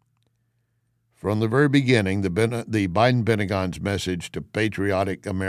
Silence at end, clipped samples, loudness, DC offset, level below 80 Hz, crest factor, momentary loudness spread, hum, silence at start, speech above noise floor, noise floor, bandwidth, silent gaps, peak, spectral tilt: 0 s; under 0.1%; -23 LUFS; under 0.1%; -46 dBFS; 20 dB; 8 LU; none; 1.25 s; 48 dB; -70 dBFS; 14.5 kHz; none; -4 dBFS; -6.5 dB/octave